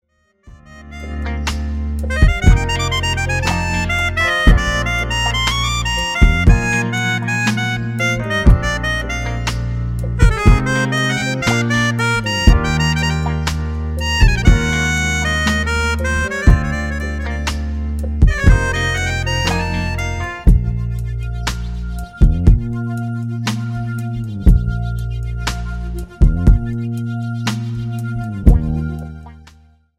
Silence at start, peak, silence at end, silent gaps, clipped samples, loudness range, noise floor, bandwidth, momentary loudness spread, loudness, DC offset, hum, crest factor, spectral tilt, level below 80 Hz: 0.45 s; 0 dBFS; 0.55 s; none; under 0.1%; 4 LU; -48 dBFS; 15 kHz; 9 LU; -17 LUFS; under 0.1%; none; 16 dB; -5 dB/octave; -18 dBFS